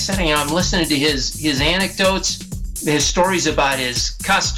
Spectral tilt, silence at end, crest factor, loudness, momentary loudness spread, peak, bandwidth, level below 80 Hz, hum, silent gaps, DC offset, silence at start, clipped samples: -3 dB/octave; 0 s; 12 dB; -17 LUFS; 4 LU; -6 dBFS; 17 kHz; -30 dBFS; none; none; under 0.1%; 0 s; under 0.1%